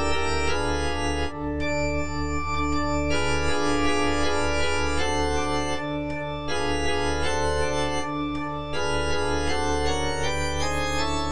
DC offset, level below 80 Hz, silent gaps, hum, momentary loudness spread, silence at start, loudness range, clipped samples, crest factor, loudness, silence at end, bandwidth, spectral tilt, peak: 3%; -34 dBFS; none; none; 4 LU; 0 s; 2 LU; under 0.1%; 14 dB; -26 LUFS; 0 s; 10.5 kHz; -4.5 dB/octave; -10 dBFS